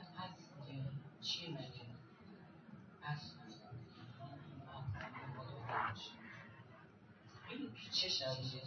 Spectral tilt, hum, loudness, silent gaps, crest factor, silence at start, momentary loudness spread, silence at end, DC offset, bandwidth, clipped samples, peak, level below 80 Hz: -3 dB/octave; none; -45 LUFS; none; 22 dB; 0 s; 20 LU; 0 s; under 0.1%; 6.8 kHz; under 0.1%; -26 dBFS; -74 dBFS